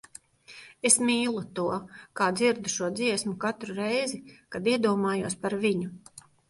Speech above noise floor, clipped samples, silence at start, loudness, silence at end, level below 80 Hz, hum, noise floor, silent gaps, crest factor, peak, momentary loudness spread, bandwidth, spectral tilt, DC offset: 24 dB; under 0.1%; 0.5 s; -27 LUFS; 0.3 s; -68 dBFS; none; -51 dBFS; none; 22 dB; -6 dBFS; 17 LU; 11.5 kHz; -3.5 dB/octave; under 0.1%